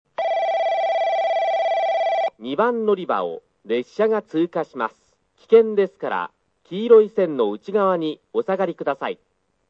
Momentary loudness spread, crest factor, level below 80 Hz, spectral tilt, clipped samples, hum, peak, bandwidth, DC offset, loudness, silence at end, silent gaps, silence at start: 12 LU; 18 dB; -76 dBFS; -6.5 dB/octave; under 0.1%; none; -2 dBFS; 6.8 kHz; under 0.1%; -21 LUFS; 0.55 s; none; 0.2 s